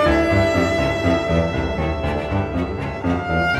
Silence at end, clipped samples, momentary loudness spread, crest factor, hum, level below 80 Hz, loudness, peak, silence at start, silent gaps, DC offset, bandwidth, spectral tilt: 0 s; under 0.1%; 7 LU; 14 dB; none; -30 dBFS; -20 LUFS; -6 dBFS; 0 s; none; under 0.1%; 14 kHz; -6.5 dB/octave